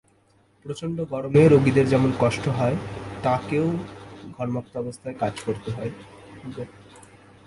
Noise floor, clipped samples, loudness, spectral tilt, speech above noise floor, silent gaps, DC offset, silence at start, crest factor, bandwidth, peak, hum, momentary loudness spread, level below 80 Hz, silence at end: -61 dBFS; under 0.1%; -23 LUFS; -7.5 dB/octave; 38 dB; none; under 0.1%; 0.65 s; 20 dB; 11.5 kHz; -4 dBFS; none; 22 LU; -52 dBFS; 0.45 s